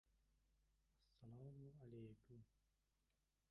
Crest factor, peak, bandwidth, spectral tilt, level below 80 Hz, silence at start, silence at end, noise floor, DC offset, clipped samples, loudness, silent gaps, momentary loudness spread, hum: 16 dB; -48 dBFS; 5.4 kHz; -9.5 dB/octave; -82 dBFS; 0.05 s; 0.9 s; -89 dBFS; under 0.1%; under 0.1%; -63 LUFS; none; 8 LU; none